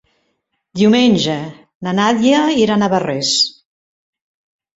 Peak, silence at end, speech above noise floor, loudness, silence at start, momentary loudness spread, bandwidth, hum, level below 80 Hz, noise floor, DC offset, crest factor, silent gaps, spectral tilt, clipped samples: -2 dBFS; 1.25 s; 55 dB; -14 LUFS; 0.75 s; 13 LU; 8 kHz; none; -56 dBFS; -69 dBFS; under 0.1%; 16 dB; 1.75-1.80 s; -4.5 dB/octave; under 0.1%